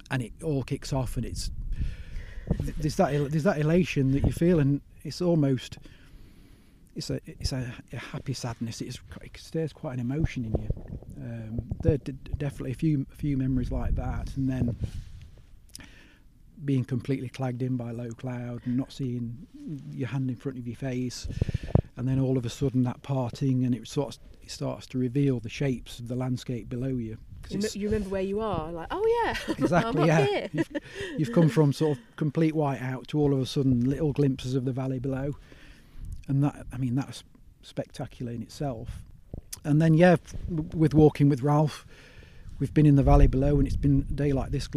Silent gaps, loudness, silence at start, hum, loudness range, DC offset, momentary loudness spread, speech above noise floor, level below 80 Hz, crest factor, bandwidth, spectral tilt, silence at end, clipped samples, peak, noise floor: none; -28 LUFS; 0.1 s; none; 9 LU; under 0.1%; 16 LU; 27 dB; -38 dBFS; 22 dB; 13.5 kHz; -7.5 dB/octave; 0 s; under 0.1%; -4 dBFS; -54 dBFS